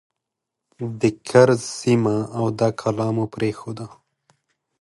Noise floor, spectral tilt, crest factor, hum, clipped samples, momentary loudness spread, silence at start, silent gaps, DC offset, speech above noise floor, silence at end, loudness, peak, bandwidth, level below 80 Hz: -83 dBFS; -6.5 dB/octave; 20 dB; none; under 0.1%; 17 LU; 0.8 s; none; under 0.1%; 62 dB; 0.95 s; -21 LUFS; -2 dBFS; 11.5 kHz; -58 dBFS